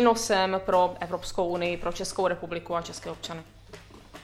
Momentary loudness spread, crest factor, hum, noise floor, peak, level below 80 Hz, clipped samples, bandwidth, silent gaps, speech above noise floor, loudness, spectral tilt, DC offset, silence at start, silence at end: 24 LU; 20 dB; none; -48 dBFS; -8 dBFS; -50 dBFS; under 0.1%; 15 kHz; none; 21 dB; -28 LUFS; -4 dB/octave; under 0.1%; 0 s; 0 s